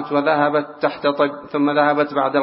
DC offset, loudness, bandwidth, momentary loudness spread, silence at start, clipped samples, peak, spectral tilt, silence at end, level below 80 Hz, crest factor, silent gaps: under 0.1%; -19 LUFS; 5.8 kHz; 4 LU; 0 s; under 0.1%; -2 dBFS; -10.5 dB/octave; 0 s; -66 dBFS; 16 dB; none